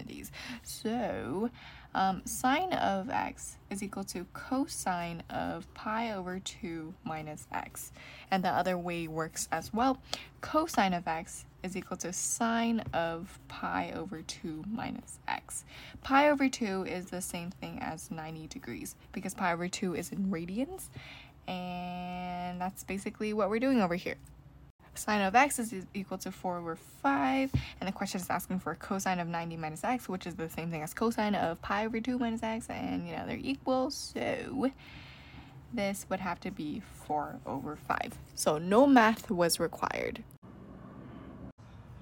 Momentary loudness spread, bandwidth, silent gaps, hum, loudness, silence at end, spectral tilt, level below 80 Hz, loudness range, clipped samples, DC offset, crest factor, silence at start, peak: 15 LU; 17 kHz; 24.70-24.79 s, 40.38-40.42 s, 41.52-41.58 s; none; -33 LUFS; 0 s; -4.5 dB/octave; -58 dBFS; 8 LU; under 0.1%; under 0.1%; 22 dB; 0 s; -10 dBFS